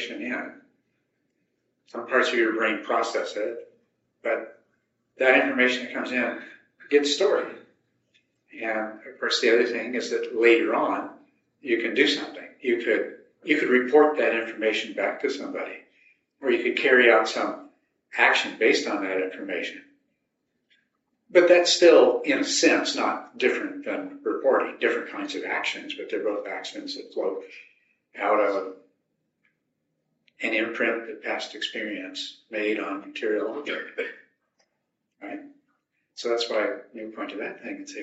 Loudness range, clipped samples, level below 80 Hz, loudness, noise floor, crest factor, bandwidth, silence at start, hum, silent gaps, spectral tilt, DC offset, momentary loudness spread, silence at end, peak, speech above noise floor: 10 LU; under 0.1%; -82 dBFS; -24 LUFS; -78 dBFS; 22 dB; 8 kHz; 0 s; none; none; 0 dB/octave; under 0.1%; 16 LU; 0 s; -2 dBFS; 54 dB